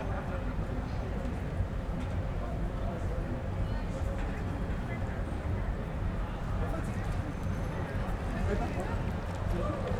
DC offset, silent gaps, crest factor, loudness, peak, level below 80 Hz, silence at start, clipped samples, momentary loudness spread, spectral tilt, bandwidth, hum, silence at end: under 0.1%; none; 14 dB; -35 LUFS; -20 dBFS; -36 dBFS; 0 s; under 0.1%; 3 LU; -7.5 dB/octave; 12.5 kHz; none; 0 s